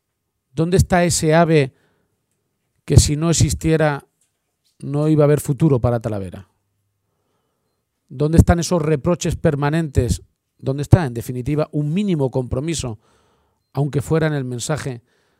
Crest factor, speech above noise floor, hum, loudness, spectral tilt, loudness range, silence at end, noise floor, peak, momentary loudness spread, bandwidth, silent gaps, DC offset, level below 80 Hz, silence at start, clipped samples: 20 dB; 57 dB; none; -18 LUFS; -6 dB/octave; 4 LU; 0.4 s; -75 dBFS; 0 dBFS; 13 LU; 15.5 kHz; none; under 0.1%; -32 dBFS; 0.55 s; under 0.1%